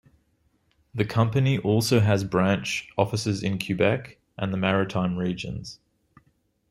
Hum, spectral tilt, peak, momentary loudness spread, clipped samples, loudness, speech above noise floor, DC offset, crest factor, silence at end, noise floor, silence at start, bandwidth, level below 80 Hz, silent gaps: none; -6 dB/octave; -6 dBFS; 11 LU; under 0.1%; -25 LUFS; 44 dB; under 0.1%; 20 dB; 0.95 s; -68 dBFS; 0.95 s; 14.5 kHz; -56 dBFS; none